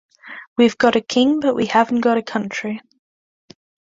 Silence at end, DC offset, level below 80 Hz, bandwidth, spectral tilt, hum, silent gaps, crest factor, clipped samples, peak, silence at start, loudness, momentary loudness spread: 1.1 s; under 0.1%; -62 dBFS; 7.8 kHz; -4.5 dB/octave; none; 0.47-0.56 s; 18 dB; under 0.1%; -2 dBFS; 0.25 s; -18 LUFS; 14 LU